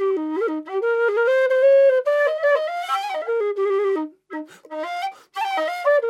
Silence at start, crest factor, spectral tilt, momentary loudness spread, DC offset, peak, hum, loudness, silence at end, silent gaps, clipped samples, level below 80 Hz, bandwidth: 0 s; 12 dB; -2 dB/octave; 15 LU; under 0.1%; -8 dBFS; none; -20 LUFS; 0 s; none; under 0.1%; -90 dBFS; 13 kHz